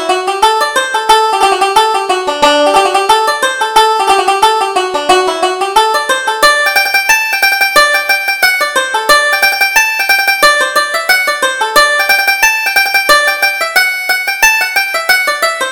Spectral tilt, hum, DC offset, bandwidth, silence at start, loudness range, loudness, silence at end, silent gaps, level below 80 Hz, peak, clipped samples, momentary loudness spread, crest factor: 0.5 dB/octave; none; under 0.1%; over 20 kHz; 0 s; 1 LU; -9 LUFS; 0 s; none; -44 dBFS; 0 dBFS; 0.2%; 5 LU; 10 dB